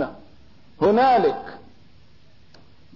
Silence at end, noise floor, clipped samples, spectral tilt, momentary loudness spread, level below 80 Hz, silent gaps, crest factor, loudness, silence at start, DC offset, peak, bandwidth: 1.4 s; -55 dBFS; under 0.1%; -7.5 dB/octave; 17 LU; -58 dBFS; none; 16 dB; -19 LUFS; 0 s; 0.4%; -8 dBFS; 6 kHz